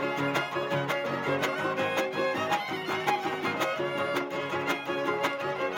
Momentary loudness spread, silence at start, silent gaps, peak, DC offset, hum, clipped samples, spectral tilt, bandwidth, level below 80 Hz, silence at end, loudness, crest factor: 2 LU; 0 s; none; -12 dBFS; under 0.1%; none; under 0.1%; -4.5 dB/octave; 17 kHz; -74 dBFS; 0 s; -29 LUFS; 18 dB